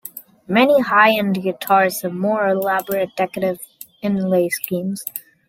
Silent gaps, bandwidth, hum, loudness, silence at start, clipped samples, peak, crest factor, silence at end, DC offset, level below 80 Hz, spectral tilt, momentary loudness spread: none; 17 kHz; none; -18 LUFS; 0.05 s; under 0.1%; -2 dBFS; 18 dB; 0.3 s; under 0.1%; -62 dBFS; -5 dB/octave; 14 LU